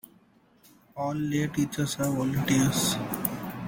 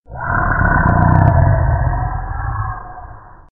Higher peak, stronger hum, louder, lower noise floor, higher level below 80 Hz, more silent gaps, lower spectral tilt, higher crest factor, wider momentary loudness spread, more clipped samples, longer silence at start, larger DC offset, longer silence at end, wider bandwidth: second, -6 dBFS vs 0 dBFS; neither; second, -27 LUFS vs -15 LUFS; first, -61 dBFS vs -36 dBFS; second, -56 dBFS vs -22 dBFS; neither; second, -4.5 dB/octave vs -12.5 dB/octave; first, 22 dB vs 14 dB; second, 8 LU vs 14 LU; neither; first, 0.95 s vs 0.1 s; neither; second, 0 s vs 0.25 s; first, 17 kHz vs 2.5 kHz